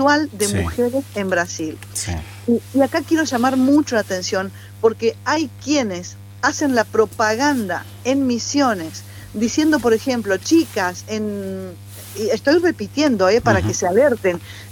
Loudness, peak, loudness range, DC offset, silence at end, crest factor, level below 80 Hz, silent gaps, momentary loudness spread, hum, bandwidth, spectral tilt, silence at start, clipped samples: -19 LUFS; 0 dBFS; 2 LU; under 0.1%; 0 s; 18 dB; -46 dBFS; none; 11 LU; none; 18 kHz; -4.5 dB/octave; 0 s; under 0.1%